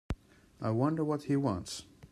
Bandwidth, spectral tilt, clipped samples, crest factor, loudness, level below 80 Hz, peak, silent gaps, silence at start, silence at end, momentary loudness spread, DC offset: 13.5 kHz; -7 dB/octave; under 0.1%; 18 dB; -33 LUFS; -52 dBFS; -16 dBFS; none; 0.1 s; 0.05 s; 13 LU; under 0.1%